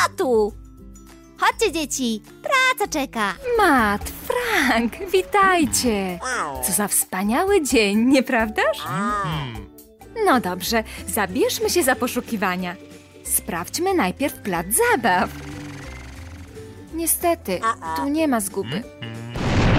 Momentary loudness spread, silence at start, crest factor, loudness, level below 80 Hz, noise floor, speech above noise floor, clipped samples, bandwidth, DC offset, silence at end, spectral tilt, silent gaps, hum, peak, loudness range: 17 LU; 0 s; 16 dB; -21 LUFS; -40 dBFS; -44 dBFS; 23 dB; under 0.1%; 16 kHz; under 0.1%; 0 s; -3.5 dB/octave; none; none; -6 dBFS; 4 LU